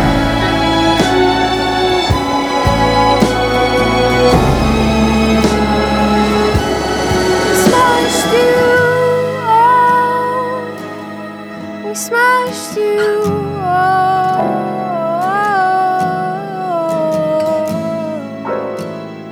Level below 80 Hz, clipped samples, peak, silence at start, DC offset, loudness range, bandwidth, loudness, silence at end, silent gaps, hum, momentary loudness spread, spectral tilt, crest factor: -28 dBFS; under 0.1%; 0 dBFS; 0 s; under 0.1%; 5 LU; over 20 kHz; -13 LUFS; 0 s; none; none; 11 LU; -5 dB/octave; 12 dB